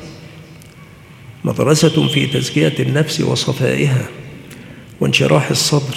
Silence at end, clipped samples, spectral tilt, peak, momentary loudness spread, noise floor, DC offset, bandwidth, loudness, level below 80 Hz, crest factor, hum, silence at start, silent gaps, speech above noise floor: 0 s; under 0.1%; -5 dB/octave; 0 dBFS; 22 LU; -39 dBFS; under 0.1%; 16 kHz; -15 LUFS; -52 dBFS; 16 dB; none; 0 s; none; 25 dB